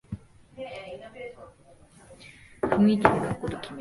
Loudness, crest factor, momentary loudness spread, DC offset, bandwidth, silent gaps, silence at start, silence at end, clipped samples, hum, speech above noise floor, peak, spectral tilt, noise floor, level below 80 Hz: -25 LUFS; 28 dB; 27 LU; under 0.1%; 11.5 kHz; none; 0.1 s; 0 s; under 0.1%; none; 31 dB; 0 dBFS; -7 dB/octave; -55 dBFS; -52 dBFS